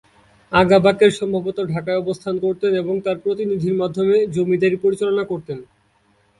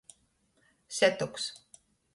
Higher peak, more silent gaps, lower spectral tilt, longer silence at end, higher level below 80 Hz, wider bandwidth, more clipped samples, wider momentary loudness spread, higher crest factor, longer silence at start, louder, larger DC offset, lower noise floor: first, 0 dBFS vs -10 dBFS; neither; first, -6.5 dB/octave vs -2.5 dB/octave; first, 0.75 s vs 0.6 s; first, -54 dBFS vs -72 dBFS; about the same, 11.5 kHz vs 11.5 kHz; neither; second, 10 LU vs 14 LU; second, 18 dB vs 24 dB; second, 0.5 s vs 0.9 s; first, -19 LUFS vs -30 LUFS; neither; second, -60 dBFS vs -71 dBFS